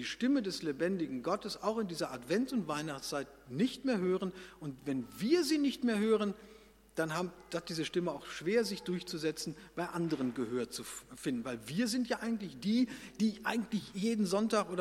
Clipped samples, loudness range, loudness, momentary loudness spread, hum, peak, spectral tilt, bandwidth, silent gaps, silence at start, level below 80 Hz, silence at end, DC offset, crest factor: under 0.1%; 3 LU; -35 LUFS; 9 LU; none; -16 dBFS; -5 dB/octave; 16.5 kHz; none; 0 s; -68 dBFS; 0 s; under 0.1%; 18 dB